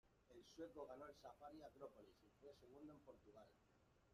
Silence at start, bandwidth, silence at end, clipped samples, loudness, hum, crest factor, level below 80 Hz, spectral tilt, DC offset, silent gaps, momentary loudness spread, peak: 0.05 s; 13.5 kHz; 0 s; under 0.1%; -62 LUFS; none; 20 dB; -82 dBFS; -5.5 dB/octave; under 0.1%; none; 11 LU; -44 dBFS